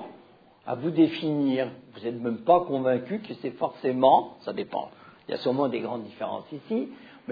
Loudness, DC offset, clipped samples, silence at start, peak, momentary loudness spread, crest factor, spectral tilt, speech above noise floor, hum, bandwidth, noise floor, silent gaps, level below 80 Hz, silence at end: -27 LUFS; under 0.1%; under 0.1%; 0 s; -6 dBFS; 15 LU; 20 dB; -9 dB/octave; 29 dB; none; 5 kHz; -55 dBFS; none; -72 dBFS; 0 s